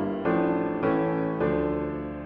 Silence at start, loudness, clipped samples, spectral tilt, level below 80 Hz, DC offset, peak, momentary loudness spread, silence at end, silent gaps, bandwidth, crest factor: 0 s; -26 LUFS; under 0.1%; -11 dB/octave; -48 dBFS; under 0.1%; -14 dBFS; 4 LU; 0 s; none; 5 kHz; 12 dB